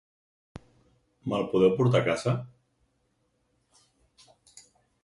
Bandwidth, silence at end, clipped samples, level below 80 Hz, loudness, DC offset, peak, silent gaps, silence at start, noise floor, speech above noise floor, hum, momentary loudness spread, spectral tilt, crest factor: 11.5 kHz; 2.55 s; under 0.1%; -64 dBFS; -26 LUFS; under 0.1%; -10 dBFS; none; 1.25 s; -73 dBFS; 48 dB; none; 14 LU; -7 dB/octave; 20 dB